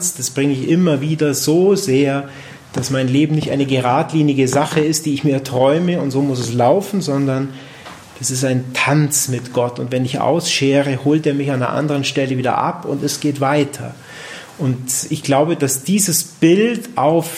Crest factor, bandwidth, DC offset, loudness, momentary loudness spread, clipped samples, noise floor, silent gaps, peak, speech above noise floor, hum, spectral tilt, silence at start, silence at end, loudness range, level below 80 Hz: 14 dB; 16 kHz; under 0.1%; -16 LUFS; 9 LU; under 0.1%; -36 dBFS; none; -2 dBFS; 20 dB; none; -5 dB/octave; 0 s; 0 s; 3 LU; -58 dBFS